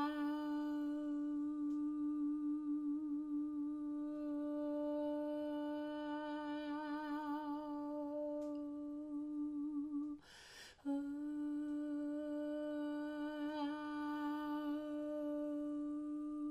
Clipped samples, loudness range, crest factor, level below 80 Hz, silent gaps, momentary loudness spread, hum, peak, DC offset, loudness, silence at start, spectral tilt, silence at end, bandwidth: under 0.1%; 3 LU; 14 dB; -76 dBFS; none; 4 LU; none; -28 dBFS; under 0.1%; -43 LUFS; 0 s; -5.5 dB/octave; 0 s; 8.2 kHz